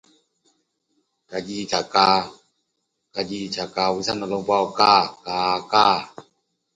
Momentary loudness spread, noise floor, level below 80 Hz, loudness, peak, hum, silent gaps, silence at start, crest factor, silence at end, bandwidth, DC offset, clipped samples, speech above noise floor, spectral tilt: 15 LU; -76 dBFS; -60 dBFS; -21 LUFS; 0 dBFS; none; none; 1.3 s; 22 dB; 0.55 s; 9.6 kHz; under 0.1%; under 0.1%; 55 dB; -3.5 dB/octave